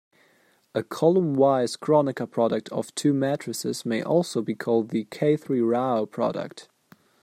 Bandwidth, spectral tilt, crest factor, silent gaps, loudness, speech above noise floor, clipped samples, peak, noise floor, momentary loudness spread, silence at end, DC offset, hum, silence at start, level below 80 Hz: 15.5 kHz; -6 dB/octave; 18 dB; none; -25 LUFS; 38 dB; under 0.1%; -6 dBFS; -62 dBFS; 9 LU; 0.6 s; under 0.1%; none; 0.75 s; -72 dBFS